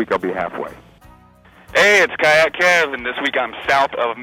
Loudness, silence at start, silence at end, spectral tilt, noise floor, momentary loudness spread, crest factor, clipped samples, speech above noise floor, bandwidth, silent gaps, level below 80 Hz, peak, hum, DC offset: -16 LUFS; 0 s; 0 s; -2.5 dB/octave; -47 dBFS; 12 LU; 12 dB; under 0.1%; 31 dB; 16.5 kHz; none; -52 dBFS; -6 dBFS; none; under 0.1%